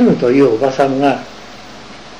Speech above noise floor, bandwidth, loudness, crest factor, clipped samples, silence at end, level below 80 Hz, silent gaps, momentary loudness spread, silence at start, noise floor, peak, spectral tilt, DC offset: 22 dB; 10 kHz; -13 LUFS; 12 dB; under 0.1%; 0 s; -48 dBFS; none; 22 LU; 0 s; -34 dBFS; -2 dBFS; -7 dB/octave; 0.9%